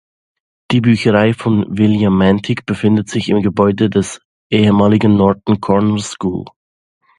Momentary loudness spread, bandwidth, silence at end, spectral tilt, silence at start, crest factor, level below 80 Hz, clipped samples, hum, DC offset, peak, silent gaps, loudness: 9 LU; 11 kHz; 0.75 s; -7 dB/octave; 0.7 s; 14 dB; -42 dBFS; under 0.1%; none; under 0.1%; 0 dBFS; 4.25-4.50 s; -14 LUFS